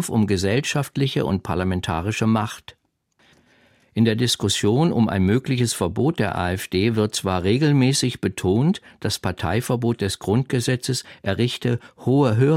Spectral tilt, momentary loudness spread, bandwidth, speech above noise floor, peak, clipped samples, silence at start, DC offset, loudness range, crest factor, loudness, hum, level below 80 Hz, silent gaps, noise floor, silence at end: -5.5 dB/octave; 6 LU; 16 kHz; 43 dB; -6 dBFS; under 0.1%; 0 s; under 0.1%; 3 LU; 16 dB; -21 LUFS; none; -48 dBFS; none; -64 dBFS; 0 s